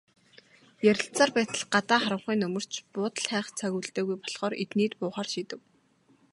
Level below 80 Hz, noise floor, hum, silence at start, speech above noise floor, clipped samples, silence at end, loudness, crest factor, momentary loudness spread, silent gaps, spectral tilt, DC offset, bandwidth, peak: -76 dBFS; -65 dBFS; none; 0.8 s; 36 dB; under 0.1%; 0.75 s; -28 LUFS; 22 dB; 9 LU; none; -4 dB/octave; under 0.1%; 11.5 kHz; -8 dBFS